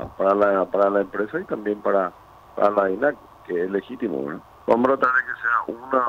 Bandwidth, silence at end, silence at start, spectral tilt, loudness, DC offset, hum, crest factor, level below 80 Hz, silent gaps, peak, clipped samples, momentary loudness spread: 7.2 kHz; 0 s; 0 s; -7.5 dB/octave; -22 LUFS; under 0.1%; none; 16 dB; -58 dBFS; none; -6 dBFS; under 0.1%; 11 LU